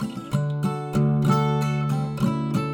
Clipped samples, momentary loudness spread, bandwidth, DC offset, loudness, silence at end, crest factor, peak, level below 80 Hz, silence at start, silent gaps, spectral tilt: under 0.1%; 6 LU; 17.5 kHz; under 0.1%; -24 LUFS; 0 s; 14 dB; -8 dBFS; -48 dBFS; 0 s; none; -7.5 dB/octave